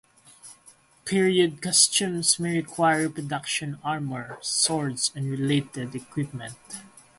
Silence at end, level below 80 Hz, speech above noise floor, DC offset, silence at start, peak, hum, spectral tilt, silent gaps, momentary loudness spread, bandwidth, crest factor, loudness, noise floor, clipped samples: 0.3 s; -64 dBFS; 30 dB; under 0.1%; 0.45 s; -4 dBFS; none; -3 dB/octave; none; 15 LU; 12 kHz; 22 dB; -24 LUFS; -56 dBFS; under 0.1%